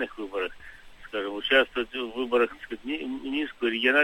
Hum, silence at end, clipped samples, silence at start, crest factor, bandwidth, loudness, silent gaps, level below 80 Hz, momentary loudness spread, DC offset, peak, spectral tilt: none; 0 s; under 0.1%; 0 s; 20 dB; 16.5 kHz; -28 LUFS; none; -56 dBFS; 12 LU; under 0.1%; -8 dBFS; -4 dB/octave